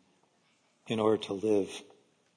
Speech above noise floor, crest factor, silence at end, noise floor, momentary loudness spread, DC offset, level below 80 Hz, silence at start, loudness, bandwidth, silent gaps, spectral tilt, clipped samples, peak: 41 dB; 18 dB; 0.55 s; -70 dBFS; 10 LU; under 0.1%; -76 dBFS; 0.85 s; -31 LUFS; 10.5 kHz; none; -5.5 dB/octave; under 0.1%; -14 dBFS